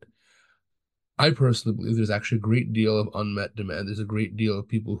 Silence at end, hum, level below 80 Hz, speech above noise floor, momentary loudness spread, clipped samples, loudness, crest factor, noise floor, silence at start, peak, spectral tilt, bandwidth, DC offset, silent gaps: 0 s; none; -58 dBFS; 58 dB; 9 LU; under 0.1%; -25 LUFS; 22 dB; -83 dBFS; 1.2 s; -4 dBFS; -6.5 dB/octave; 11.5 kHz; under 0.1%; none